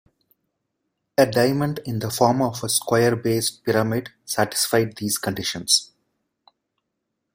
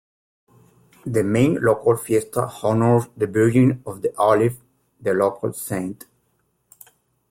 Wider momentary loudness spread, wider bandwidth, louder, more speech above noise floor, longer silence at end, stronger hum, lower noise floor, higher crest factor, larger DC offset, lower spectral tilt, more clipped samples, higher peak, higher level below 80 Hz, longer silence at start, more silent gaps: about the same, 8 LU vs 10 LU; about the same, 16.5 kHz vs 16.5 kHz; about the same, -21 LUFS vs -20 LUFS; first, 57 dB vs 48 dB; first, 1.5 s vs 1.35 s; neither; first, -79 dBFS vs -68 dBFS; about the same, 20 dB vs 16 dB; neither; second, -4 dB/octave vs -7 dB/octave; neither; about the same, -2 dBFS vs -4 dBFS; about the same, -58 dBFS vs -56 dBFS; first, 1.2 s vs 1.05 s; neither